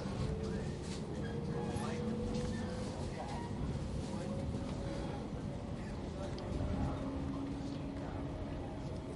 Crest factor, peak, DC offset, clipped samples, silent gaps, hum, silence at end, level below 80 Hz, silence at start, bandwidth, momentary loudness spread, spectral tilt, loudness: 16 dB; -24 dBFS; under 0.1%; under 0.1%; none; none; 0 s; -48 dBFS; 0 s; 11.5 kHz; 4 LU; -7 dB/octave; -41 LUFS